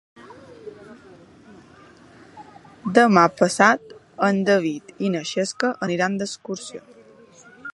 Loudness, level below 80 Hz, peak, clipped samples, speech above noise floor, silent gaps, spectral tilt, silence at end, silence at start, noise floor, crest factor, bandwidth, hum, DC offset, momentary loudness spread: -20 LUFS; -68 dBFS; 0 dBFS; under 0.1%; 29 dB; none; -5 dB/octave; 0.05 s; 0.25 s; -49 dBFS; 22 dB; 11.5 kHz; none; under 0.1%; 25 LU